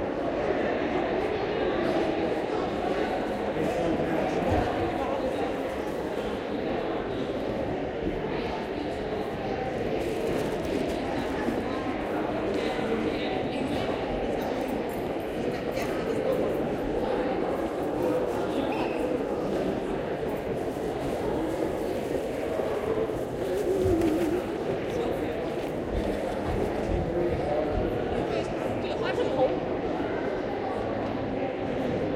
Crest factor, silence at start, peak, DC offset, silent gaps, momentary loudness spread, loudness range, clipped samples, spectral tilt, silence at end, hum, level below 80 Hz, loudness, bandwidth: 16 dB; 0 s; -12 dBFS; under 0.1%; none; 4 LU; 2 LU; under 0.1%; -6.5 dB/octave; 0 s; none; -44 dBFS; -29 LUFS; 16 kHz